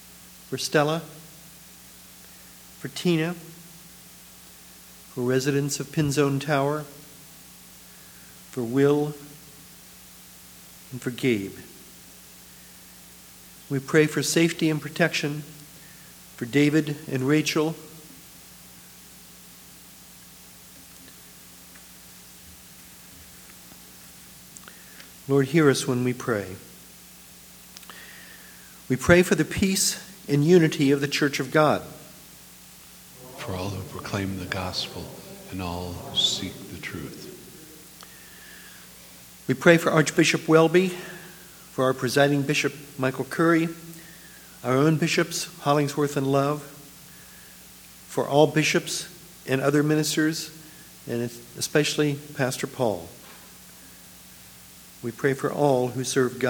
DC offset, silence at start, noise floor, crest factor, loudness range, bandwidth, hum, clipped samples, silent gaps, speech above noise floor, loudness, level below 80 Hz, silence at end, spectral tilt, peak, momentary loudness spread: under 0.1%; 0.05 s; -48 dBFS; 24 dB; 11 LU; over 20 kHz; none; under 0.1%; none; 24 dB; -24 LUFS; -58 dBFS; 0 s; -4.5 dB/octave; -2 dBFS; 24 LU